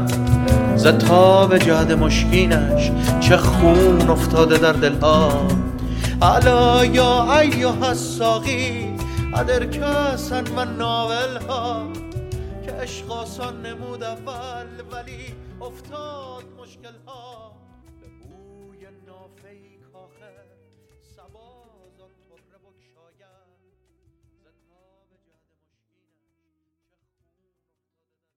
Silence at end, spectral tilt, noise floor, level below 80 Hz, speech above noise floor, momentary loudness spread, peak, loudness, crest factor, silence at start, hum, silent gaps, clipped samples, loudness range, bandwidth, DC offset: 10.95 s; -5.5 dB/octave; -80 dBFS; -30 dBFS; 63 dB; 21 LU; 0 dBFS; -17 LUFS; 20 dB; 0 s; none; none; under 0.1%; 21 LU; 17 kHz; under 0.1%